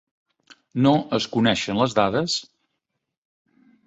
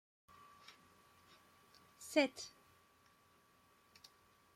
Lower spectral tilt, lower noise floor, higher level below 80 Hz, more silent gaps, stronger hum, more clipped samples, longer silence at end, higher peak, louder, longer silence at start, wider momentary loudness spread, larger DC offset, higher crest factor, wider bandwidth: first, -5 dB/octave vs -2.5 dB/octave; first, -80 dBFS vs -71 dBFS; first, -58 dBFS vs -86 dBFS; neither; neither; neither; second, 1.45 s vs 2.05 s; first, -4 dBFS vs -20 dBFS; first, -22 LUFS vs -39 LUFS; second, 0.75 s vs 2 s; second, 6 LU vs 29 LU; neither; second, 20 dB vs 28 dB; second, 8.2 kHz vs 16.5 kHz